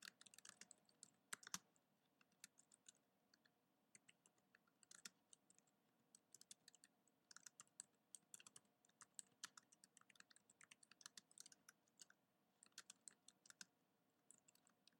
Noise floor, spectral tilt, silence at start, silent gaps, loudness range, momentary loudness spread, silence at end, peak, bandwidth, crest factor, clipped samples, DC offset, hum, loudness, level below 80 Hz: -86 dBFS; 0.5 dB/octave; 0 s; none; 6 LU; 11 LU; 0 s; -30 dBFS; 16.5 kHz; 40 dB; under 0.1%; under 0.1%; none; -63 LUFS; under -90 dBFS